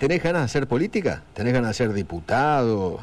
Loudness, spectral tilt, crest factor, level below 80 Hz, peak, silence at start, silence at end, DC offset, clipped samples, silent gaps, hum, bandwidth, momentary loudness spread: -23 LUFS; -6.5 dB/octave; 10 dB; -46 dBFS; -12 dBFS; 0 s; 0 s; under 0.1%; under 0.1%; none; none; 12.5 kHz; 6 LU